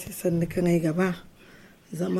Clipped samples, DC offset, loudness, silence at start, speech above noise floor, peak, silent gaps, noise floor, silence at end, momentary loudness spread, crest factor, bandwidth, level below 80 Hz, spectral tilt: under 0.1%; under 0.1%; -26 LUFS; 0 s; 26 dB; -12 dBFS; none; -52 dBFS; 0 s; 13 LU; 14 dB; 15.5 kHz; -52 dBFS; -7 dB/octave